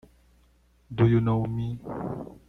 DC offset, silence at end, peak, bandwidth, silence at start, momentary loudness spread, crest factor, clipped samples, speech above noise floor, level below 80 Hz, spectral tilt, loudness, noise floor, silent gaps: under 0.1%; 0.15 s; -8 dBFS; 4 kHz; 0.9 s; 13 LU; 20 dB; under 0.1%; 37 dB; -50 dBFS; -10 dB/octave; -26 LUFS; -62 dBFS; none